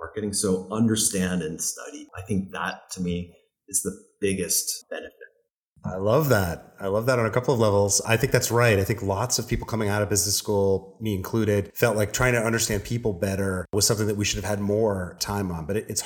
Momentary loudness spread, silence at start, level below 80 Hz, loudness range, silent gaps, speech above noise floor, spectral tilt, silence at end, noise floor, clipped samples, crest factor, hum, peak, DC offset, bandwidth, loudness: 10 LU; 0 s; -46 dBFS; 6 LU; 5.51-5.76 s; 43 dB; -4 dB/octave; 0 s; -68 dBFS; under 0.1%; 24 dB; none; -2 dBFS; under 0.1%; 19 kHz; -24 LUFS